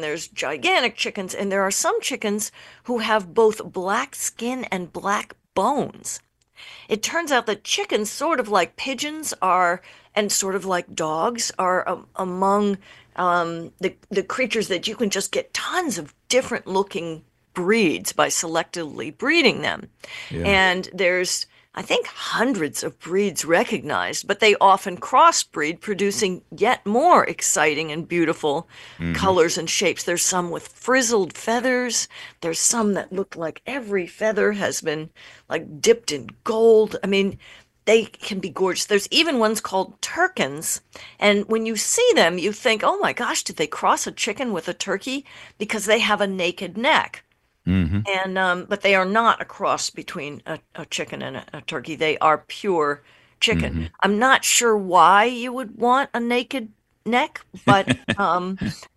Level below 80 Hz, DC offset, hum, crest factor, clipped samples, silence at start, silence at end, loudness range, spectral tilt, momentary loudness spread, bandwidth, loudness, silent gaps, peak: -50 dBFS; under 0.1%; none; 22 dB; under 0.1%; 0 s; 0.1 s; 5 LU; -3 dB/octave; 13 LU; 13 kHz; -21 LUFS; none; 0 dBFS